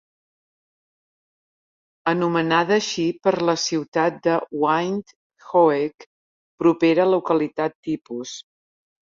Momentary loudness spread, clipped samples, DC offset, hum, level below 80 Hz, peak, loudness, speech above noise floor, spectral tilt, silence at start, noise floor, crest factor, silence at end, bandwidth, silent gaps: 11 LU; under 0.1%; under 0.1%; none; -68 dBFS; -4 dBFS; -21 LUFS; over 69 dB; -5 dB/octave; 2.05 s; under -90 dBFS; 18 dB; 0.75 s; 7.6 kHz; 3.88-3.92 s, 5.16-5.30 s, 6.06-6.58 s, 7.75-7.83 s, 8.01-8.05 s